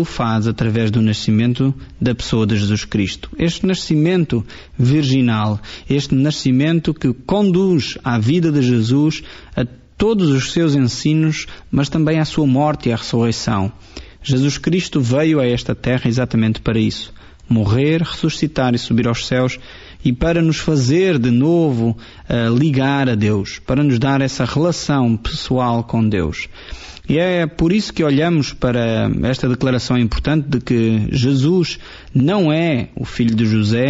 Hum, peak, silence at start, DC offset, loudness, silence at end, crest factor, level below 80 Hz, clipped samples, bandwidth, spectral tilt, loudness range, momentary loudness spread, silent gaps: none; -4 dBFS; 0 s; under 0.1%; -17 LUFS; 0 s; 12 dB; -36 dBFS; under 0.1%; 8 kHz; -6 dB/octave; 2 LU; 7 LU; none